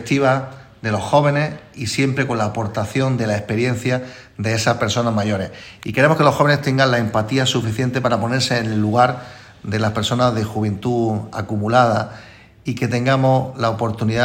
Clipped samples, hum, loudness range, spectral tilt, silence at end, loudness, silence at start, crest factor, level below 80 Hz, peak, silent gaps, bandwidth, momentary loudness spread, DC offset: under 0.1%; none; 3 LU; -5.5 dB/octave; 0 s; -19 LUFS; 0 s; 18 dB; -50 dBFS; 0 dBFS; none; 16.5 kHz; 10 LU; under 0.1%